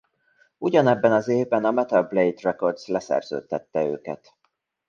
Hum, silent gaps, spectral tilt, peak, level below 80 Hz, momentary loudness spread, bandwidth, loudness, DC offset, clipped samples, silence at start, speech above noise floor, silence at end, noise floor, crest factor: none; none; -7 dB/octave; -4 dBFS; -68 dBFS; 11 LU; 7.4 kHz; -23 LUFS; under 0.1%; under 0.1%; 0.6 s; 50 dB; 0.75 s; -73 dBFS; 20 dB